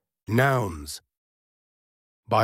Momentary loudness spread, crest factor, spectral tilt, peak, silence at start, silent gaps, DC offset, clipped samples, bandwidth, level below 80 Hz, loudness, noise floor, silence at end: 16 LU; 20 dB; -6 dB/octave; -8 dBFS; 0.3 s; 1.18-2.23 s; under 0.1%; under 0.1%; 16.5 kHz; -52 dBFS; -24 LUFS; under -90 dBFS; 0 s